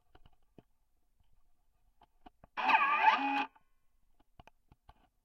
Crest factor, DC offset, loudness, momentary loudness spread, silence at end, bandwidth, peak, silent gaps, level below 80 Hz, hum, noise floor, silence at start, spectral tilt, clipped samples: 24 dB; under 0.1%; -30 LUFS; 14 LU; 1.75 s; 12.5 kHz; -14 dBFS; none; -70 dBFS; none; -72 dBFS; 2.55 s; -3 dB/octave; under 0.1%